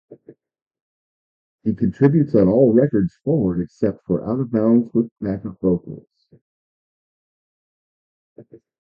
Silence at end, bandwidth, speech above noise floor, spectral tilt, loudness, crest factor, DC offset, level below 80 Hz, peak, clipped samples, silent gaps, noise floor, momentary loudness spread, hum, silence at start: 0.25 s; 5 kHz; 30 dB; -11.5 dB/octave; -19 LUFS; 20 dB; under 0.1%; -50 dBFS; -2 dBFS; under 0.1%; 0.62-0.71 s, 0.81-1.58 s, 5.11-5.16 s, 6.41-8.36 s; -48 dBFS; 12 LU; none; 0.1 s